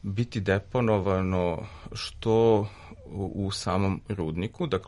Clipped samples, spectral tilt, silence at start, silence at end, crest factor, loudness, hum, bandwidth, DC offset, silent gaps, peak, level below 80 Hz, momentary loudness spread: under 0.1%; -6.5 dB/octave; 0.05 s; 0 s; 16 dB; -27 LUFS; none; 11.5 kHz; under 0.1%; none; -10 dBFS; -48 dBFS; 13 LU